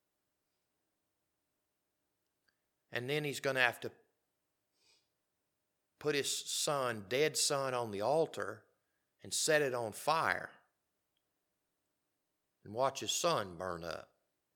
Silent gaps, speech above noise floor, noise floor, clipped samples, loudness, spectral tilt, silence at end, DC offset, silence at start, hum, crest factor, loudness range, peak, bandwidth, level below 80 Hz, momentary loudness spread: none; 50 dB; -85 dBFS; under 0.1%; -35 LUFS; -2.5 dB/octave; 0.5 s; under 0.1%; 2.9 s; none; 26 dB; 5 LU; -12 dBFS; 19 kHz; -80 dBFS; 13 LU